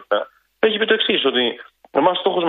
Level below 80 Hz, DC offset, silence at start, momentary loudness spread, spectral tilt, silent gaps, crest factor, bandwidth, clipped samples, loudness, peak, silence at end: -68 dBFS; under 0.1%; 0 s; 8 LU; -7 dB/octave; none; 18 dB; 4.5 kHz; under 0.1%; -18 LUFS; -2 dBFS; 0 s